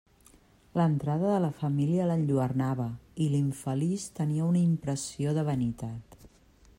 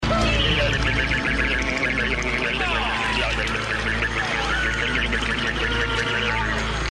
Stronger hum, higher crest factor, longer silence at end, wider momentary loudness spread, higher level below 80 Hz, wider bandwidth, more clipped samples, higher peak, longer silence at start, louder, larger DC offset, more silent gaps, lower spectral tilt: neither; about the same, 16 dB vs 14 dB; first, 0.5 s vs 0 s; first, 7 LU vs 3 LU; second, -60 dBFS vs -30 dBFS; first, 16 kHz vs 11.5 kHz; neither; second, -14 dBFS vs -8 dBFS; first, 0.75 s vs 0 s; second, -29 LUFS vs -22 LUFS; neither; neither; first, -7.5 dB/octave vs -4 dB/octave